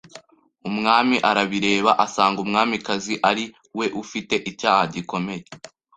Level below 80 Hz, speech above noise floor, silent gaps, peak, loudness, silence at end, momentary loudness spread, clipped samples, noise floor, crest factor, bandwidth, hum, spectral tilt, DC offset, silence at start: -60 dBFS; 27 dB; none; -2 dBFS; -21 LUFS; 0.3 s; 12 LU; under 0.1%; -48 dBFS; 20 dB; 9.4 kHz; none; -4 dB/octave; under 0.1%; 0.15 s